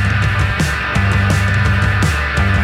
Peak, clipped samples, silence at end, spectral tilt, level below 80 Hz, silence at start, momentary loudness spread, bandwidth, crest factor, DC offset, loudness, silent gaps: -4 dBFS; under 0.1%; 0 s; -5.5 dB/octave; -22 dBFS; 0 s; 2 LU; 14 kHz; 12 dB; under 0.1%; -15 LUFS; none